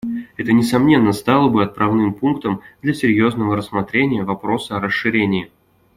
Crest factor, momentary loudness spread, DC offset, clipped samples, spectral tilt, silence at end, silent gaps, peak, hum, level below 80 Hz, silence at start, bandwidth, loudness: 16 dB; 9 LU; under 0.1%; under 0.1%; -6.5 dB/octave; 0.5 s; none; -2 dBFS; none; -52 dBFS; 0.05 s; 15.5 kHz; -17 LUFS